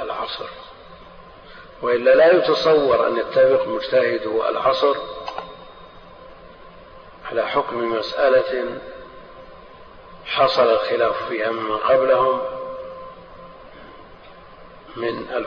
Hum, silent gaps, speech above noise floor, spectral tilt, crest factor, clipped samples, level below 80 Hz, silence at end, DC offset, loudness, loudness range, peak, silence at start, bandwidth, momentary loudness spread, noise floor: none; none; 24 dB; -5.5 dB/octave; 18 dB; under 0.1%; -52 dBFS; 0 s; under 0.1%; -19 LUFS; 8 LU; -4 dBFS; 0 s; 6.6 kHz; 22 LU; -43 dBFS